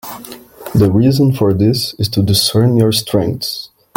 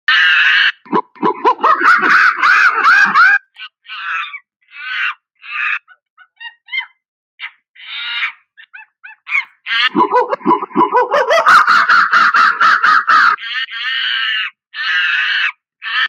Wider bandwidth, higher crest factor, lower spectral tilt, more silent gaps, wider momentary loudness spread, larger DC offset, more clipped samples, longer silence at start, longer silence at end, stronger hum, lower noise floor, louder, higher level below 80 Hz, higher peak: first, 17 kHz vs 15 kHz; about the same, 12 dB vs 14 dB; first, -6 dB/octave vs -2.5 dB/octave; second, none vs 4.56-4.60 s, 6.10-6.17 s, 7.08-7.38 s, 7.69-7.74 s; about the same, 16 LU vs 18 LU; neither; neither; about the same, 0.05 s vs 0.1 s; first, 0.3 s vs 0 s; neither; second, -34 dBFS vs -40 dBFS; about the same, -13 LUFS vs -12 LUFS; first, -42 dBFS vs -76 dBFS; about the same, 0 dBFS vs 0 dBFS